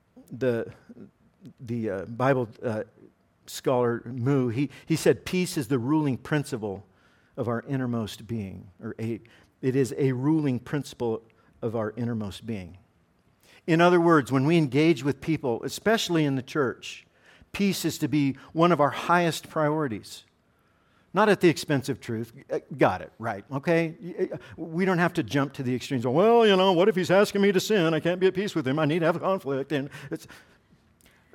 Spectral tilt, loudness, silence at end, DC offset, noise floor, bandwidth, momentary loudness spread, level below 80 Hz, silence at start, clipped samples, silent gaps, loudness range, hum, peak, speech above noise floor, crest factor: -6 dB/octave; -26 LUFS; 1 s; under 0.1%; -65 dBFS; 17 kHz; 15 LU; -64 dBFS; 0.15 s; under 0.1%; none; 8 LU; none; -6 dBFS; 40 dB; 20 dB